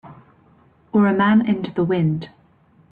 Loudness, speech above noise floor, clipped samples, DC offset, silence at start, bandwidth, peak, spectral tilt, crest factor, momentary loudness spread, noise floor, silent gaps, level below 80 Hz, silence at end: -19 LUFS; 37 dB; under 0.1%; under 0.1%; 0.05 s; 4.7 kHz; -6 dBFS; -10 dB/octave; 14 dB; 9 LU; -55 dBFS; none; -58 dBFS; 0.65 s